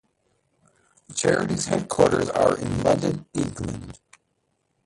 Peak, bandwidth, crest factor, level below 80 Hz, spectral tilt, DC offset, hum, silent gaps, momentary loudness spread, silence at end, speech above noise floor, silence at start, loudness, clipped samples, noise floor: -4 dBFS; 11.5 kHz; 20 dB; -48 dBFS; -5 dB/octave; under 0.1%; none; none; 13 LU; 0.9 s; 50 dB; 1.1 s; -23 LUFS; under 0.1%; -72 dBFS